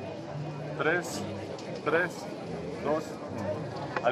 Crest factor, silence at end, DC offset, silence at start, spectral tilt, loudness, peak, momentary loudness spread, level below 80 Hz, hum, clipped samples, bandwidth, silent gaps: 20 dB; 0 s; under 0.1%; 0 s; -5.5 dB/octave; -33 LUFS; -12 dBFS; 10 LU; -60 dBFS; none; under 0.1%; 14.5 kHz; none